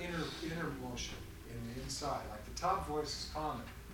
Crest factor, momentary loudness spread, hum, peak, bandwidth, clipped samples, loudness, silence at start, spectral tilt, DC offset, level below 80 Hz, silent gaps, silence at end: 20 dB; 9 LU; none; -22 dBFS; 19 kHz; under 0.1%; -41 LUFS; 0 s; -4 dB/octave; under 0.1%; -52 dBFS; none; 0 s